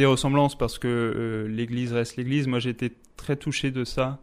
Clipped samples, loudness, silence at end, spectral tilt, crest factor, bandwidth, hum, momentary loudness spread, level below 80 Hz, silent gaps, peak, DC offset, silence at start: under 0.1%; -26 LUFS; 0.05 s; -6 dB/octave; 18 dB; 15.5 kHz; none; 8 LU; -44 dBFS; none; -8 dBFS; under 0.1%; 0 s